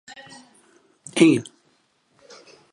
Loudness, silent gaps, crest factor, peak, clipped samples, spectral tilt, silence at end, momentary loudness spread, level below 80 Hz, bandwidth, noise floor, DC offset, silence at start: -19 LUFS; none; 24 dB; -2 dBFS; under 0.1%; -5 dB/octave; 1.3 s; 27 LU; -72 dBFS; 11.5 kHz; -65 dBFS; under 0.1%; 1.15 s